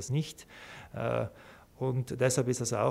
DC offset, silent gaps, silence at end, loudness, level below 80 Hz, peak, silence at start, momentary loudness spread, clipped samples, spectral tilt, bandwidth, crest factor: under 0.1%; none; 0 s; -32 LUFS; -60 dBFS; -14 dBFS; 0 s; 18 LU; under 0.1%; -5 dB/octave; 15.5 kHz; 18 dB